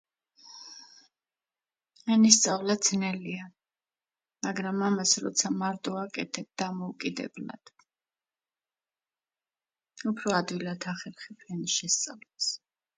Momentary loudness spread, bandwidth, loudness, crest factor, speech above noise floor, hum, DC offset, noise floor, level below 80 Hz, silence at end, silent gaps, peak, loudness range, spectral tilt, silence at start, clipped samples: 19 LU; 9.6 kHz; -28 LUFS; 30 dB; over 61 dB; none; under 0.1%; under -90 dBFS; -76 dBFS; 0.4 s; none; -2 dBFS; 12 LU; -3 dB/octave; 0.45 s; under 0.1%